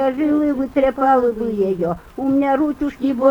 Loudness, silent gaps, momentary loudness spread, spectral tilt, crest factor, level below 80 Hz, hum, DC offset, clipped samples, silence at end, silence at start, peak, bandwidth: -18 LUFS; none; 6 LU; -8 dB/octave; 16 dB; -46 dBFS; none; under 0.1%; under 0.1%; 0 s; 0 s; -2 dBFS; 18 kHz